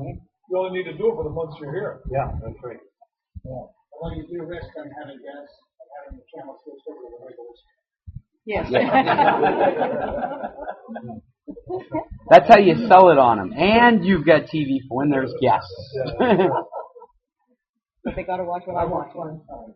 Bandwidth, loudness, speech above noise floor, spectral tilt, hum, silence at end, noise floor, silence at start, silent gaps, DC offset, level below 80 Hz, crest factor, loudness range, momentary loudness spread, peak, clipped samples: 6 kHz; -18 LUFS; 55 dB; -4.5 dB/octave; none; 0.1 s; -75 dBFS; 0 s; 17.69-17.73 s; under 0.1%; -46 dBFS; 20 dB; 22 LU; 26 LU; 0 dBFS; under 0.1%